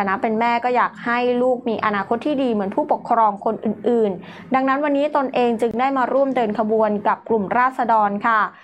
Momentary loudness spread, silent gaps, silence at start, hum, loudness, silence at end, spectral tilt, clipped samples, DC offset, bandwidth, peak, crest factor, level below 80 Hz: 4 LU; none; 0 s; none; -19 LUFS; 0.15 s; -7 dB/octave; under 0.1%; under 0.1%; 10.5 kHz; -4 dBFS; 14 dB; -64 dBFS